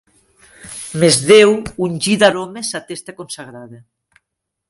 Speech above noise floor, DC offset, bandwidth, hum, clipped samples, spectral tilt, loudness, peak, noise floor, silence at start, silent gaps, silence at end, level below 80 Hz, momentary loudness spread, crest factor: 63 dB; under 0.1%; 11.5 kHz; none; under 0.1%; -3.5 dB/octave; -14 LUFS; 0 dBFS; -78 dBFS; 0.65 s; none; 0.95 s; -52 dBFS; 21 LU; 16 dB